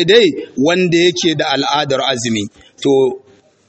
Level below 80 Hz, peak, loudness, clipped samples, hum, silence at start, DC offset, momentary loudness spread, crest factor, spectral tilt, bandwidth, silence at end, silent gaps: -54 dBFS; 0 dBFS; -14 LUFS; under 0.1%; none; 0 s; under 0.1%; 9 LU; 14 dB; -4 dB/octave; 8.8 kHz; 0.5 s; none